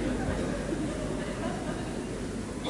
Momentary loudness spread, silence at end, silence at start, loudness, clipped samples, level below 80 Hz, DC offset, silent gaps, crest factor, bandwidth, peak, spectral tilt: 4 LU; 0 s; 0 s; -33 LUFS; under 0.1%; -42 dBFS; under 0.1%; none; 14 dB; 11.5 kHz; -18 dBFS; -5.5 dB/octave